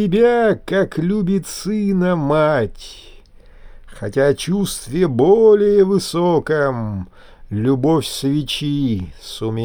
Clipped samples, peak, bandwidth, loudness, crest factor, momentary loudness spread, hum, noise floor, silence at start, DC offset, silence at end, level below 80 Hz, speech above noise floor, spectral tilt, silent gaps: under 0.1%; -2 dBFS; over 20 kHz; -17 LUFS; 14 dB; 13 LU; none; -42 dBFS; 0 s; under 0.1%; 0 s; -42 dBFS; 25 dB; -6 dB/octave; none